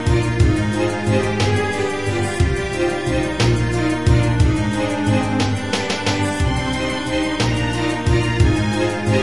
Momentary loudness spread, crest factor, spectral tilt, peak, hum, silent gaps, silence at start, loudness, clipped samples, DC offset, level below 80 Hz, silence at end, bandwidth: 4 LU; 16 dB; -6 dB/octave; -2 dBFS; none; none; 0 s; -19 LUFS; under 0.1%; 1%; -28 dBFS; 0 s; 11.5 kHz